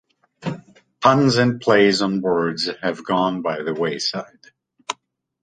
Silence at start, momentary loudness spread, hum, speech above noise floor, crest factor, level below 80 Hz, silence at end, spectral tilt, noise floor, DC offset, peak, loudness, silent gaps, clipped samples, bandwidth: 0.4 s; 17 LU; none; 40 dB; 20 dB; -58 dBFS; 0.5 s; -5 dB/octave; -59 dBFS; under 0.1%; -2 dBFS; -19 LUFS; none; under 0.1%; 9.6 kHz